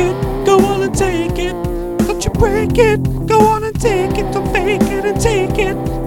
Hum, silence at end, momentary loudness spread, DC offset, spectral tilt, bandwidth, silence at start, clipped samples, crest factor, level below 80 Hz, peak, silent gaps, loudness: none; 0 s; 6 LU; under 0.1%; -6 dB/octave; 18 kHz; 0 s; under 0.1%; 14 dB; -26 dBFS; 0 dBFS; none; -15 LUFS